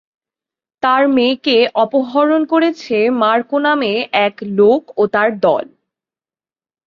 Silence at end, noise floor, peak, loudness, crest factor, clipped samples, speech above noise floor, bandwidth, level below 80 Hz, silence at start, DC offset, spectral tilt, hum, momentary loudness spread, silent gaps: 1.25 s; under -90 dBFS; -2 dBFS; -14 LUFS; 14 dB; under 0.1%; over 76 dB; 7 kHz; -62 dBFS; 0.85 s; under 0.1%; -6 dB/octave; none; 4 LU; none